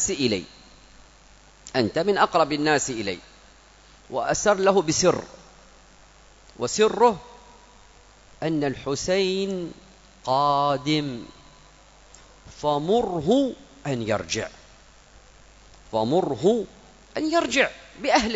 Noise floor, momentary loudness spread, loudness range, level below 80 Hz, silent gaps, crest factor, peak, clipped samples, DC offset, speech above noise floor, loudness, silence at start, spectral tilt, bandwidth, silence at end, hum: -52 dBFS; 13 LU; 4 LU; -52 dBFS; none; 20 dB; -4 dBFS; under 0.1%; under 0.1%; 29 dB; -23 LUFS; 0 s; -4 dB/octave; 8 kHz; 0 s; none